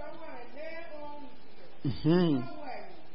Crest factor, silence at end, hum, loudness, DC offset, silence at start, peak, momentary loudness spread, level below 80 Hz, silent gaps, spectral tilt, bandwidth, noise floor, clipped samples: 18 dB; 0.05 s; none; -32 LUFS; 2%; 0 s; -14 dBFS; 20 LU; -60 dBFS; none; -11 dB/octave; 5.6 kHz; -55 dBFS; under 0.1%